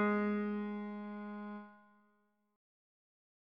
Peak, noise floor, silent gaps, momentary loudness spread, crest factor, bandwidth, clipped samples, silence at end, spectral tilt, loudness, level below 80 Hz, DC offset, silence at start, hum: -24 dBFS; -77 dBFS; none; 15 LU; 18 dB; 5 kHz; under 0.1%; 1.65 s; -6.5 dB/octave; -40 LUFS; -84 dBFS; under 0.1%; 0 s; none